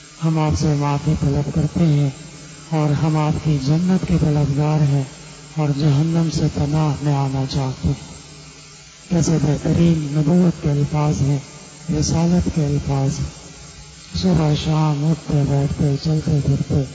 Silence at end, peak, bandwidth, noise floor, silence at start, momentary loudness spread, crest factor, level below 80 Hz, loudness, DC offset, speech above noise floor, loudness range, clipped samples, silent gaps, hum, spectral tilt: 0 s; -6 dBFS; 8 kHz; -41 dBFS; 0 s; 19 LU; 12 dB; -36 dBFS; -19 LUFS; under 0.1%; 24 dB; 3 LU; under 0.1%; none; none; -7 dB/octave